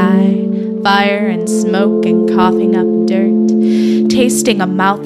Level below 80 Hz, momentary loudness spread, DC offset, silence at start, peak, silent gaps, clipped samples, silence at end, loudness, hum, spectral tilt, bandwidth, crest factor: -52 dBFS; 4 LU; under 0.1%; 0 s; 0 dBFS; none; under 0.1%; 0 s; -12 LUFS; none; -5.5 dB/octave; 14 kHz; 12 dB